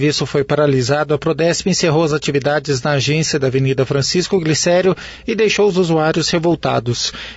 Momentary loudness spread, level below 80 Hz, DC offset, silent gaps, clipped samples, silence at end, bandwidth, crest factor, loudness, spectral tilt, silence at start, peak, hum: 4 LU; -44 dBFS; under 0.1%; none; under 0.1%; 0 s; 8 kHz; 12 dB; -16 LUFS; -4.5 dB/octave; 0 s; -4 dBFS; none